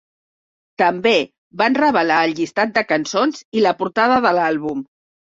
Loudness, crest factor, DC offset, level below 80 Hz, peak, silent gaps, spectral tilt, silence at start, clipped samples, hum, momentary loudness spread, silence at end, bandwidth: -17 LUFS; 16 dB; under 0.1%; -60 dBFS; -2 dBFS; 1.38-1.51 s, 3.45-3.52 s; -4.5 dB/octave; 0.8 s; under 0.1%; none; 5 LU; 0.5 s; 7.8 kHz